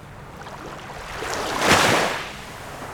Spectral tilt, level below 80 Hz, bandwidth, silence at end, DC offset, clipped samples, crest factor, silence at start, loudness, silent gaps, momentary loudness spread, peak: -3 dB/octave; -46 dBFS; 19.5 kHz; 0 s; under 0.1%; under 0.1%; 22 dB; 0 s; -20 LUFS; none; 21 LU; -2 dBFS